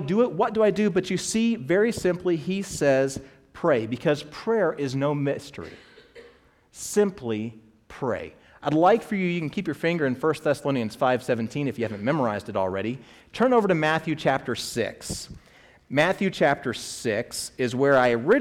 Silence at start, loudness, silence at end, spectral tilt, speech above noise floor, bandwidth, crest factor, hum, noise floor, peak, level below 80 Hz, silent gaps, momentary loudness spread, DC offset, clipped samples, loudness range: 0 s; -25 LUFS; 0 s; -5.5 dB/octave; 32 dB; 16.5 kHz; 16 dB; none; -56 dBFS; -8 dBFS; -58 dBFS; none; 12 LU; under 0.1%; under 0.1%; 4 LU